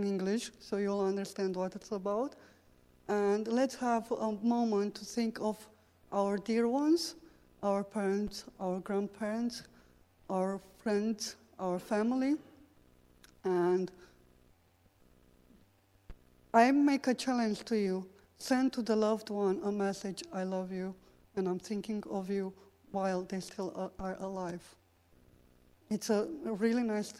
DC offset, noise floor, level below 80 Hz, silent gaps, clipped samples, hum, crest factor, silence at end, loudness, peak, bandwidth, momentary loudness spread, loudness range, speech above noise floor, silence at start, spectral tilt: under 0.1%; -67 dBFS; -66 dBFS; none; under 0.1%; none; 22 dB; 0 s; -34 LUFS; -12 dBFS; 16 kHz; 10 LU; 7 LU; 34 dB; 0 s; -5.5 dB/octave